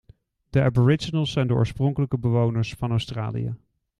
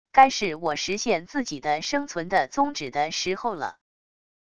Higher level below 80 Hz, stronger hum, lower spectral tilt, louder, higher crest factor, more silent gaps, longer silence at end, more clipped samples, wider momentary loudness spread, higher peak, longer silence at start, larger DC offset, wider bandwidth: first, -48 dBFS vs -60 dBFS; neither; first, -7.5 dB/octave vs -3 dB/octave; about the same, -24 LUFS vs -25 LUFS; about the same, 18 dB vs 22 dB; neither; second, 0.45 s vs 0.7 s; neither; about the same, 9 LU vs 10 LU; about the same, -6 dBFS vs -4 dBFS; first, 0.55 s vs 0.1 s; second, under 0.1% vs 0.4%; about the same, 11 kHz vs 10 kHz